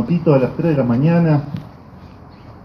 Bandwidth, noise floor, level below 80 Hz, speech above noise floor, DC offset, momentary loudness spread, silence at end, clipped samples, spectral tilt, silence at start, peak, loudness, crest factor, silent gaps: 5.8 kHz; -39 dBFS; -46 dBFS; 24 dB; under 0.1%; 10 LU; 0.05 s; under 0.1%; -10.5 dB/octave; 0 s; 0 dBFS; -16 LUFS; 16 dB; none